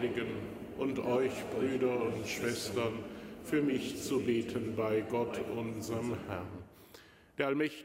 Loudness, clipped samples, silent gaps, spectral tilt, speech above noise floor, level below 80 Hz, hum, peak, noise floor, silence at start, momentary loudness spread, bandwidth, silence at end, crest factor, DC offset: -35 LUFS; under 0.1%; none; -5.5 dB/octave; 24 dB; -64 dBFS; none; -16 dBFS; -58 dBFS; 0 s; 11 LU; 16 kHz; 0 s; 18 dB; under 0.1%